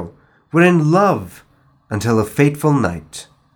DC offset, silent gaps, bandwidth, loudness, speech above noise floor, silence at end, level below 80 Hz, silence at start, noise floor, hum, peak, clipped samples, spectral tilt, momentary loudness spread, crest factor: under 0.1%; none; 19 kHz; -16 LUFS; 21 dB; 0.3 s; -52 dBFS; 0 s; -36 dBFS; none; 0 dBFS; under 0.1%; -7 dB/octave; 21 LU; 16 dB